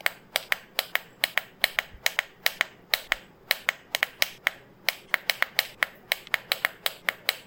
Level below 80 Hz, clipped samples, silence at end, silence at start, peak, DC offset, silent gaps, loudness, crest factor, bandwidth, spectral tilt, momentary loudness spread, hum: -62 dBFS; under 0.1%; 0.05 s; 0.05 s; 0 dBFS; under 0.1%; none; -28 LUFS; 30 dB; 17 kHz; 1 dB/octave; 4 LU; none